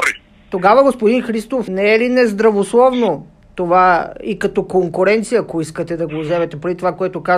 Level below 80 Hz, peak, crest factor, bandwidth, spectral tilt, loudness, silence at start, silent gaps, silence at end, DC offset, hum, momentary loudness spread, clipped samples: -48 dBFS; 0 dBFS; 14 dB; 14 kHz; -5.5 dB/octave; -15 LUFS; 0 s; none; 0 s; under 0.1%; none; 11 LU; under 0.1%